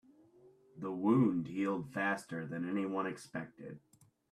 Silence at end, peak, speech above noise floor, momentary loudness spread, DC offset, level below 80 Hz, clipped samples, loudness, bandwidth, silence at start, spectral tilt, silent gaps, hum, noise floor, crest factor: 0.55 s; -18 dBFS; 28 dB; 18 LU; under 0.1%; -76 dBFS; under 0.1%; -36 LUFS; 13 kHz; 0.45 s; -7.5 dB/octave; none; none; -64 dBFS; 20 dB